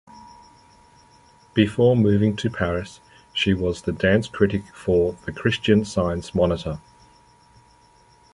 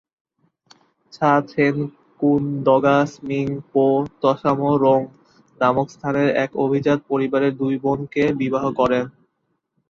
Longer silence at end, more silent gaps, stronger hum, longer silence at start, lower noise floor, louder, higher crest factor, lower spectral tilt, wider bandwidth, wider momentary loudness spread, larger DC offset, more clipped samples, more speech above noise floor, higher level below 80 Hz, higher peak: first, 1.55 s vs 0.8 s; neither; neither; second, 0.15 s vs 1.15 s; second, -55 dBFS vs -72 dBFS; about the same, -22 LUFS vs -20 LUFS; about the same, 20 dB vs 18 dB; about the same, -6.5 dB/octave vs -7.5 dB/octave; first, 11.5 kHz vs 7.2 kHz; first, 10 LU vs 7 LU; neither; neither; second, 34 dB vs 53 dB; first, -42 dBFS vs -56 dBFS; about the same, -2 dBFS vs -2 dBFS